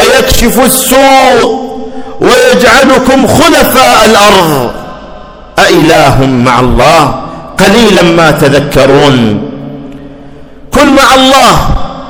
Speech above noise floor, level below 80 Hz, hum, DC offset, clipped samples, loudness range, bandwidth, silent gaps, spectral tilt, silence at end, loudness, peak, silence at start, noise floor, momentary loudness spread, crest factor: 24 dB; -22 dBFS; none; under 0.1%; 20%; 3 LU; over 20 kHz; none; -4 dB/octave; 0 s; -4 LUFS; 0 dBFS; 0 s; -27 dBFS; 15 LU; 6 dB